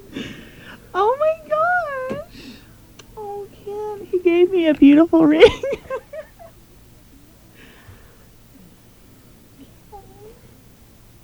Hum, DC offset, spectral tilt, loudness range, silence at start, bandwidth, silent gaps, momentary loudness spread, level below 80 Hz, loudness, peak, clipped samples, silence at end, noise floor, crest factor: none; under 0.1%; -6 dB/octave; 8 LU; 0.1 s; over 20 kHz; none; 26 LU; -48 dBFS; -17 LUFS; 0 dBFS; under 0.1%; 0.95 s; -48 dBFS; 20 dB